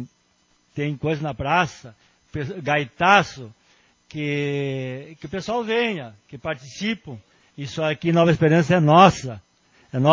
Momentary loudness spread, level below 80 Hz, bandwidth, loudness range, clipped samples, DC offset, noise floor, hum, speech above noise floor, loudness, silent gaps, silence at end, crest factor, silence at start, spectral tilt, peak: 20 LU; -52 dBFS; 7.6 kHz; 8 LU; under 0.1%; under 0.1%; -63 dBFS; none; 42 dB; -21 LUFS; none; 0 s; 22 dB; 0 s; -6 dB/octave; 0 dBFS